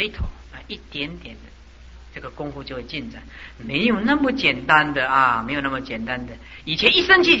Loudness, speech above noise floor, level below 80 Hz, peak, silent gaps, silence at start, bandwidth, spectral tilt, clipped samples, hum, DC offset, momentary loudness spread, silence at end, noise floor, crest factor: -19 LUFS; 22 dB; -40 dBFS; -2 dBFS; none; 0 s; 8 kHz; -5 dB/octave; under 0.1%; none; 0.1%; 21 LU; 0 s; -43 dBFS; 20 dB